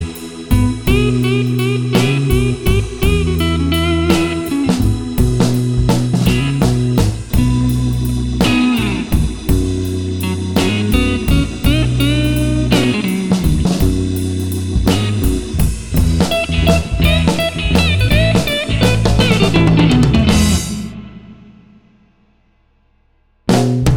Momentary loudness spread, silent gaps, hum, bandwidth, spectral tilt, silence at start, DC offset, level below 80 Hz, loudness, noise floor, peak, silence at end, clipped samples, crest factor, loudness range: 6 LU; none; none; 20 kHz; -6 dB/octave; 0 s; under 0.1%; -22 dBFS; -15 LUFS; -56 dBFS; 0 dBFS; 0 s; under 0.1%; 14 dB; 3 LU